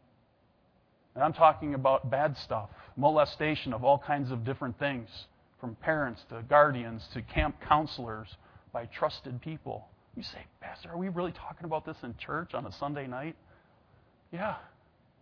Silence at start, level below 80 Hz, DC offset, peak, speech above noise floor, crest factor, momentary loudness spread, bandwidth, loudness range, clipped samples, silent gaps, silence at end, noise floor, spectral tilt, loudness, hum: 1.15 s; -52 dBFS; under 0.1%; -8 dBFS; 37 dB; 24 dB; 19 LU; 5.4 kHz; 11 LU; under 0.1%; none; 0.55 s; -67 dBFS; -8 dB/octave; -31 LUFS; none